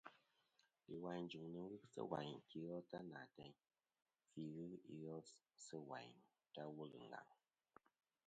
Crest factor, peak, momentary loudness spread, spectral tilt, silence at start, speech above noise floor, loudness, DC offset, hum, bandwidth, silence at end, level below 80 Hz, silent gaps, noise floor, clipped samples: 26 dB; -30 dBFS; 12 LU; -6 dB/octave; 0.05 s; 30 dB; -55 LUFS; under 0.1%; none; 8.8 kHz; 0.95 s; -90 dBFS; none; -84 dBFS; under 0.1%